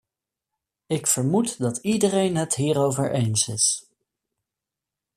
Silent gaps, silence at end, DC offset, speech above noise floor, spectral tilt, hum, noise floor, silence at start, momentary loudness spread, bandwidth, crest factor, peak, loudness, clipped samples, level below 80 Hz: none; 1.35 s; under 0.1%; 65 dB; -4.5 dB/octave; none; -87 dBFS; 0.9 s; 5 LU; 15 kHz; 18 dB; -8 dBFS; -22 LUFS; under 0.1%; -62 dBFS